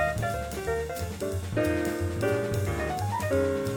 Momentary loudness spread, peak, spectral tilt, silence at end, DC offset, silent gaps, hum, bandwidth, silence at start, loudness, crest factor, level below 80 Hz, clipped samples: 6 LU; -14 dBFS; -6 dB/octave; 0 s; under 0.1%; none; none; 19 kHz; 0 s; -29 LUFS; 14 dB; -42 dBFS; under 0.1%